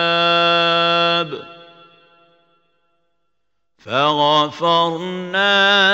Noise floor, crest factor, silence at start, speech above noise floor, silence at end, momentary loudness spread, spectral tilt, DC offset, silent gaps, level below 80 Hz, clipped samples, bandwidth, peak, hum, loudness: -77 dBFS; 16 dB; 0 s; 61 dB; 0 s; 10 LU; -4 dB/octave; under 0.1%; none; -70 dBFS; under 0.1%; 16 kHz; -2 dBFS; none; -15 LUFS